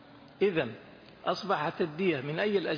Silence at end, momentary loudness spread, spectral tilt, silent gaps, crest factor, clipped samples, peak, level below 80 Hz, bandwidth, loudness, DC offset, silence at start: 0 s; 8 LU; -6.5 dB/octave; none; 16 dB; under 0.1%; -16 dBFS; -70 dBFS; 5.2 kHz; -31 LUFS; under 0.1%; 0.05 s